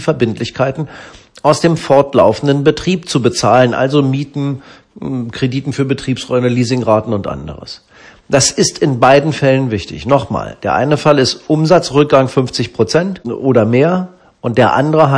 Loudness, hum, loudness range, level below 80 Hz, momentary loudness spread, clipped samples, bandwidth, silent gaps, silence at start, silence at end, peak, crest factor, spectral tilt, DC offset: -13 LUFS; none; 4 LU; -44 dBFS; 11 LU; 0.6%; 10.5 kHz; none; 0 s; 0 s; 0 dBFS; 12 dB; -5.5 dB/octave; under 0.1%